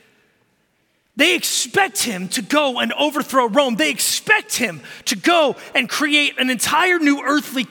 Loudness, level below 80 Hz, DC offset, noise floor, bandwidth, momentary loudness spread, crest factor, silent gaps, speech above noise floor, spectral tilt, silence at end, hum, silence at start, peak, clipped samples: -17 LUFS; -66 dBFS; under 0.1%; -64 dBFS; 17.5 kHz; 6 LU; 18 dB; none; 46 dB; -2 dB/octave; 0.05 s; none; 1.15 s; -2 dBFS; under 0.1%